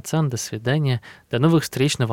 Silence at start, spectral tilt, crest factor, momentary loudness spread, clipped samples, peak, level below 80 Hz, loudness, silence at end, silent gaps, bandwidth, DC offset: 0.05 s; -5.5 dB/octave; 14 dB; 8 LU; under 0.1%; -8 dBFS; -58 dBFS; -22 LUFS; 0 s; none; 17 kHz; under 0.1%